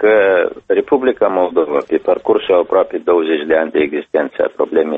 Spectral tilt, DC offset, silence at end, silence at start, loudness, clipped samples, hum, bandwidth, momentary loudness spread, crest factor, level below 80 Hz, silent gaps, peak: -7 dB/octave; under 0.1%; 0 s; 0 s; -15 LUFS; under 0.1%; none; 3.9 kHz; 4 LU; 14 dB; -54 dBFS; none; 0 dBFS